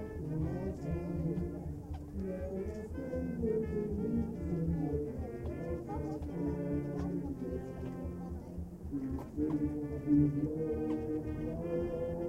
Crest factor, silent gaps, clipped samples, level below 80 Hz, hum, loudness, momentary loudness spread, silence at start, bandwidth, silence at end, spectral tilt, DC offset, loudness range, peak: 18 dB; none; under 0.1%; -48 dBFS; none; -37 LUFS; 8 LU; 0 s; 15 kHz; 0 s; -10 dB/octave; under 0.1%; 4 LU; -18 dBFS